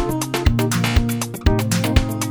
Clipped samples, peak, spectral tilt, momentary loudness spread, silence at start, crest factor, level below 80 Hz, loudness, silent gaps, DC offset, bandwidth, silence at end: under 0.1%; 0 dBFS; -5 dB/octave; 3 LU; 0 s; 18 dB; -24 dBFS; -19 LUFS; none; under 0.1%; over 20 kHz; 0 s